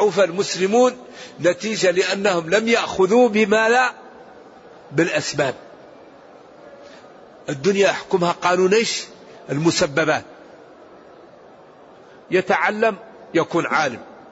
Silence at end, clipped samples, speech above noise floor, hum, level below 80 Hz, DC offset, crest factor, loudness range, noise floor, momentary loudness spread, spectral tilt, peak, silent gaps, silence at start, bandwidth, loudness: 0.1 s; under 0.1%; 27 dB; none; -62 dBFS; under 0.1%; 16 dB; 7 LU; -45 dBFS; 11 LU; -4 dB/octave; -4 dBFS; none; 0 s; 8 kHz; -19 LUFS